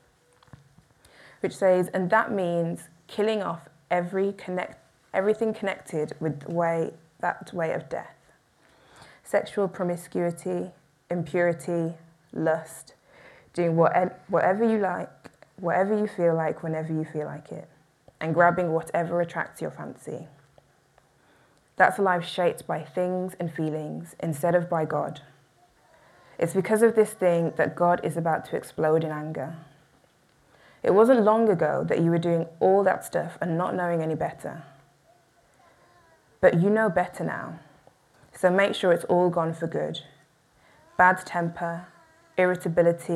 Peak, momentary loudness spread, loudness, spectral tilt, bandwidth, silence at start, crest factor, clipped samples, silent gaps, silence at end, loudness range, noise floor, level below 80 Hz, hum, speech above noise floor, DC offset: -4 dBFS; 15 LU; -25 LUFS; -6.5 dB/octave; 14 kHz; 1.45 s; 24 dB; under 0.1%; none; 0 s; 6 LU; -62 dBFS; -68 dBFS; none; 37 dB; under 0.1%